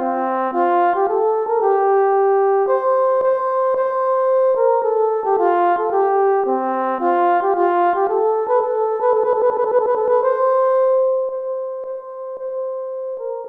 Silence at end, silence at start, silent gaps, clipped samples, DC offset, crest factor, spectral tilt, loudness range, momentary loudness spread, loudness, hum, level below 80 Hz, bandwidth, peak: 0 s; 0 s; none; under 0.1%; under 0.1%; 12 dB; -7 dB/octave; 2 LU; 10 LU; -17 LUFS; none; -66 dBFS; 3.9 kHz; -6 dBFS